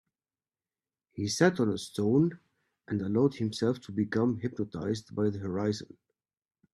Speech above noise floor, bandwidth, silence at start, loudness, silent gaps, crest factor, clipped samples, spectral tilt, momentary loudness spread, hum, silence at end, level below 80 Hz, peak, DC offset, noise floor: over 61 dB; 13 kHz; 1.15 s; -30 LUFS; none; 22 dB; under 0.1%; -6 dB/octave; 9 LU; none; 0.9 s; -68 dBFS; -10 dBFS; under 0.1%; under -90 dBFS